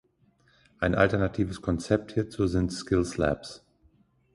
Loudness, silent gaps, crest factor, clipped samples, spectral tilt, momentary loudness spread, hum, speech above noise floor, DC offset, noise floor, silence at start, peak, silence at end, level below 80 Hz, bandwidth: -28 LUFS; none; 22 dB; under 0.1%; -6.5 dB/octave; 8 LU; none; 39 dB; under 0.1%; -65 dBFS; 0.8 s; -8 dBFS; 0.8 s; -44 dBFS; 11.5 kHz